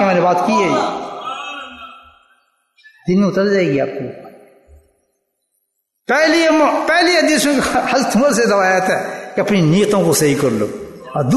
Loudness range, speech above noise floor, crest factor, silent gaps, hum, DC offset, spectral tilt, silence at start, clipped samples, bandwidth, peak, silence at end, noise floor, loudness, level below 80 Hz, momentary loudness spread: 7 LU; 56 dB; 14 dB; none; none; under 0.1%; -4.5 dB/octave; 0 s; under 0.1%; 12.5 kHz; -2 dBFS; 0 s; -70 dBFS; -15 LUFS; -52 dBFS; 15 LU